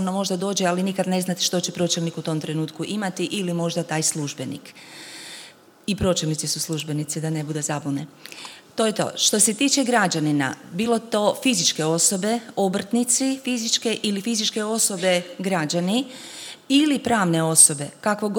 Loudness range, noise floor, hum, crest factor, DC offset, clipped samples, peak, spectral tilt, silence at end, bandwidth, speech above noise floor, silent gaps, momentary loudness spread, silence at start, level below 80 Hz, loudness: 7 LU; -46 dBFS; none; 22 dB; under 0.1%; under 0.1%; -2 dBFS; -3 dB/octave; 0 s; 19 kHz; 24 dB; none; 15 LU; 0 s; -56 dBFS; -21 LUFS